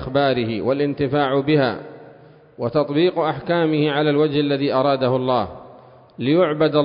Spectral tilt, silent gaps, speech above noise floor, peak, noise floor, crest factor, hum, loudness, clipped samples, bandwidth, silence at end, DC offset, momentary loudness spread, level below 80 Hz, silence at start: -11.5 dB/octave; none; 28 dB; -4 dBFS; -46 dBFS; 16 dB; none; -19 LUFS; under 0.1%; 5.4 kHz; 0 s; under 0.1%; 5 LU; -52 dBFS; 0 s